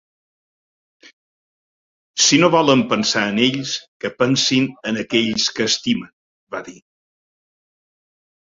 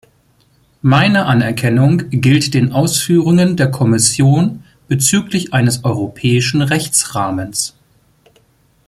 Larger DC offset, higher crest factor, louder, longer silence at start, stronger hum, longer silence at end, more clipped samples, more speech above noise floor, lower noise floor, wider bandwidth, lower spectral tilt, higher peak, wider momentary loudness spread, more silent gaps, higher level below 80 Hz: neither; first, 20 dB vs 14 dB; second, -17 LUFS vs -13 LUFS; first, 2.15 s vs 0.85 s; neither; first, 1.75 s vs 1.2 s; neither; first, over 72 dB vs 42 dB; first, under -90 dBFS vs -54 dBFS; second, 7.8 kHz vs 15.5 kHz; second, -3 dB/octave vs -4.5 dB/octave; about the same, 0 dBFS vs 0 dBFS; first, 16 LU vs 8 LU; first, 3.88-4.00 s, 6.13-6.47 s vs none; second, -60 dBFS vs -48 dBFS